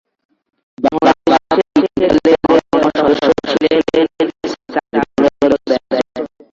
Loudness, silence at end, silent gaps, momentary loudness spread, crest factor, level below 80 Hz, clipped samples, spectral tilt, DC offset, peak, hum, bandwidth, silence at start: -14 LUFS; 0.3 s; none; 7 LU; 14 dB; -46 dBFS; under 0.1%; -5.5 dB/octave; under 0.1%; 0 dBFS; none; 7.6 kHz; 0.8 s